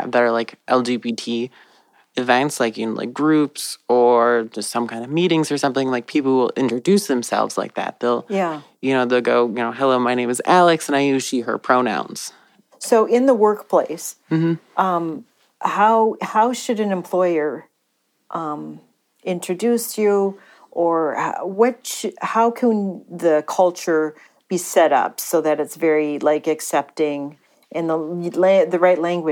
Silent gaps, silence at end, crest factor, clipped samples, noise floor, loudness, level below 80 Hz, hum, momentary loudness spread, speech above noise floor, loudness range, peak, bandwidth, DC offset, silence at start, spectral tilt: none; 0 s; 18 dB; under 0.1%; -69 dBFS; -19 LUFS; -80 dBFS; none; 11 LU; 50 dB; 4 LU; -2 dBFS; 18 kHz; under 0.1%; 0 s; -5 dB/octave